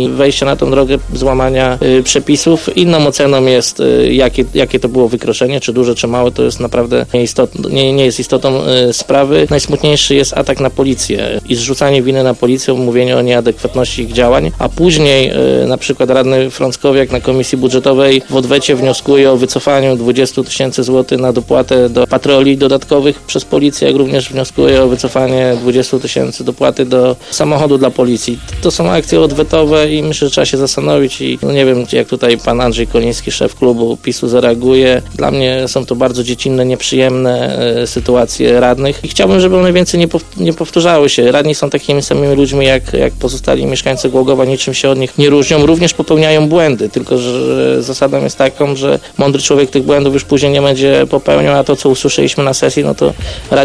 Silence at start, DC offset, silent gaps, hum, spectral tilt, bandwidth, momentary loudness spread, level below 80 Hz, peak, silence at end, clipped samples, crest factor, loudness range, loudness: 0 s; 0.3%; none; none; -5 dB/octave; 11 kHz; 5 LU; -30 dBFS; 0 dBFS; 0 s; 0.4%; 10 dB; 2 LU; -10 LUFS